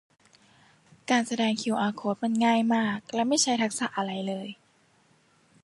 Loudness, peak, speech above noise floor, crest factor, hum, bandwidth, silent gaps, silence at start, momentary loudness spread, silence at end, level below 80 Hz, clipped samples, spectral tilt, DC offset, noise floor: -27 LUFS; -10 dBFS; 38 dB; 18 dB; none; 11.5 kHz; none; 1.1 s; 9 LU; 1.1 s; -76 dBFS; under 0.1%; -3.5 dB/octave; under 0.1%; -64 dBFS